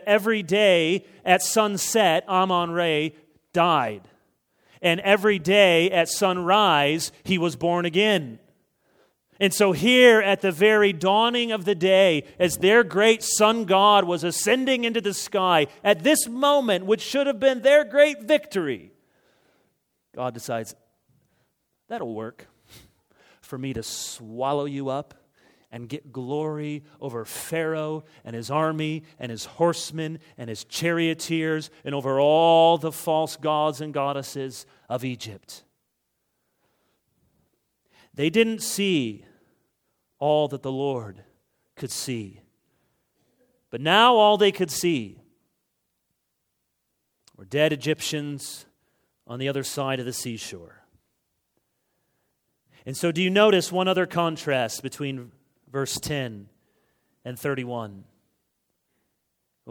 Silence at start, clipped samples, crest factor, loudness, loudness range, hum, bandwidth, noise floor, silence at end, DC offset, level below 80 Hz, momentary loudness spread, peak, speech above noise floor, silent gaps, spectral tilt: 0 s; under 0.1%; 22 dB; -22 LUFS; 15 LU; none; 20 kHz; -77 dBFS; 0 s; under 0.1%; -66 dBFS; 17 LU; -2 dBFS; 55 dB; none; -4 dB/octave